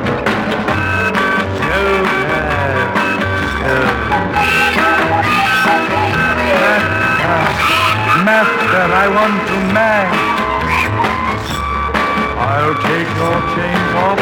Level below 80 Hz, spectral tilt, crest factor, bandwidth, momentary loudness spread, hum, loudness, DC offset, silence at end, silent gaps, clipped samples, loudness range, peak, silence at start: -34 dBFS; -5 dB/octave; 12 dB; 20 kHz; 4 LU; none; -13 LUFS; under 0.1%; 0 s; none; under 0.1%; 3 LU; -2 dBFS; 0 s